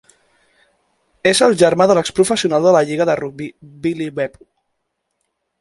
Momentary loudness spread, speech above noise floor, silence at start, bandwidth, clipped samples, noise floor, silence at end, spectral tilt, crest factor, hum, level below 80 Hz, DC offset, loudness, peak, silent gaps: 13 LU; 58 dB; 1.25 s; 11.5 kHz; under 0.1%; -73 dBFS; 1.35 s; -4.5 dB/octave; 18 dB; none; -56 dBFS; under 0.1%; -15 LUFS; 0 dBFS; none